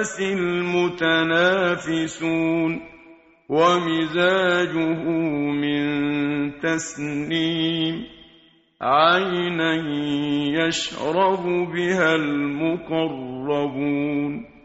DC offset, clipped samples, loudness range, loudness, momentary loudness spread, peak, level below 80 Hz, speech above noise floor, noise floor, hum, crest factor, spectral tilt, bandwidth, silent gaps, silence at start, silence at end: under 0.1%; under 0.1%; 2 LU; -22 LUFS; 8 LU; -4 dBFS; -58 dBFS; 33 dB; -55 dBFS; none; 18 dB; -3.5 dB/octave; 8 kHz; none; 0 s; 0.2 s